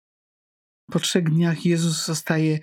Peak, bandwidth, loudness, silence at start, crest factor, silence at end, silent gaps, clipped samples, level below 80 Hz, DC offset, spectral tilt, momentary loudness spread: -4 dBFS; 16.5 kHz; -22 LUFS; 0.9 s; 18 dB; 0 s; none; under 0.1%; -68 dBFS; under 0.1%; -5 dB/octave; 4 LU